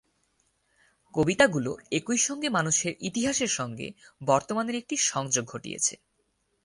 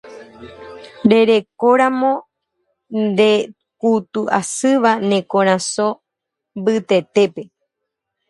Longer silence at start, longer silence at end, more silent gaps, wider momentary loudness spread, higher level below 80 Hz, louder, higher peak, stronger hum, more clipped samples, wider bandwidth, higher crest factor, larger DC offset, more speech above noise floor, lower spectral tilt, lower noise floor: first, 1.15 s vs 0.05 s; second, 0.7 s vs 0.85 s; neither; second, 12 LU vs 18 LU; about the same, -62 dBFS vs -62 dBFS; second, -27 LUFS vs -16 LUFS; second, -8 dBFS vs 0 dBFS; neither; neither; about the same, 11.5 kHz vs 11.5 kHz; about the same, 22 dB vs 18 dB; neither; second, 46 dB vs 65 dB; second, -3 dB/octave vs -4.5 dB/octave; second, -73 dBFS vs -81 dBFS